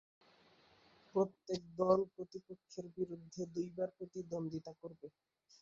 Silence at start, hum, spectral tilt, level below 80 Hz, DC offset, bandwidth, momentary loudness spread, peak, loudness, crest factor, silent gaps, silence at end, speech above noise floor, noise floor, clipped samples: 1.15 s; none; -7.5 dB/octave; -76 dBFS; under 0.1%; 7.6 kHz; 19 LU; -18 dBFS; -41 LUFS; 24 dB; none; 0.5 s; 28 dB; -69 dBFS; under 0.1%